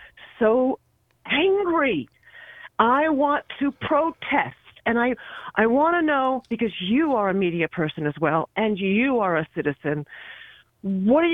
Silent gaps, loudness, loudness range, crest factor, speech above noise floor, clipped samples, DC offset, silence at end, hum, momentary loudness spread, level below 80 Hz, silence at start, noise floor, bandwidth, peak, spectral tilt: none; -23 LUFS; 2 LU; 18 dB; 23 dB; under 0.1%; under 0.1%; 0 s; none; 11 LU; -58 dBFS; 0 s; -45 dBFS; 3.9 kHz; -4 dBFS; -8.5 dB/octave